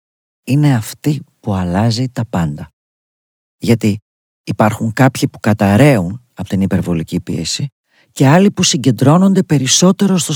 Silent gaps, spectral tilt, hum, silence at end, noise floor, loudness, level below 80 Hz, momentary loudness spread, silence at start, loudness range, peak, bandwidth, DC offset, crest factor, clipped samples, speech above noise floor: 2.73-3.59 s, 4.02-4.44 s, 7.72-7.84 s; -5 dB/octave; none; 0 s; under -90 dBFS; -14 LUFS; -46 dBFS; 13 LU; 0.45 s; 6 LU; 0 dBFS; 18.5 kHz; under 0.1%; 14 dB; 0.2%; over 77 dB